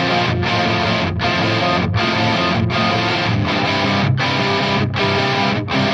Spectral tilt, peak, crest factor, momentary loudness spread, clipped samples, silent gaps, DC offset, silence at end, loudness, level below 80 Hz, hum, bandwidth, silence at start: -5.5 dB/octave; -4 dBFS; 12 dB; 2 LU; under 0.1%; none; under 0.1%; 0 s; -17 LUFS; -42 dBFS; none; 9.4 kHz; 0 s